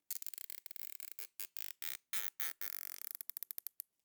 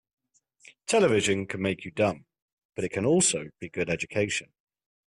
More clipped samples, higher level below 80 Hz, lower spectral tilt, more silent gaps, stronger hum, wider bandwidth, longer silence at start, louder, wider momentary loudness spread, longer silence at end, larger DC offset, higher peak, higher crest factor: neither; second, under -90 dBFS vs -62 dBFS; second, 3.5 dB/octave vs -4 dB/octave; second, none vs 2.42-2.57 s, 2.65-2.69 s; neither; first, over 20 kHz vs 12 kHz; second, 0.1 s vs 0.9 s; second, -42 LUFS vs -27 LUFS; second, 8 LU vs 13 LU; first, 1.1 s vs 0.75 s; neither; second, -18 dBFS vs -12 dBFS; first, 28 dB vs 16 dB